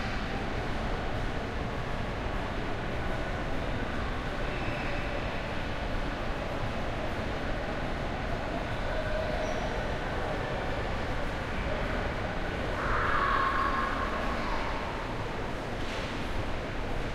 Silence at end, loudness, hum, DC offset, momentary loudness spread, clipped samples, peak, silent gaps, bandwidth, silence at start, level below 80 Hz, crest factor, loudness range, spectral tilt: 0 s; -33 LUFS; none; under 0.1%; 5 LU; under 0.1%; -16 dBFS; none; 12.5 kHz; 0 s; -36 dBFS; 16 dB; 4 LU; -6 dB/octave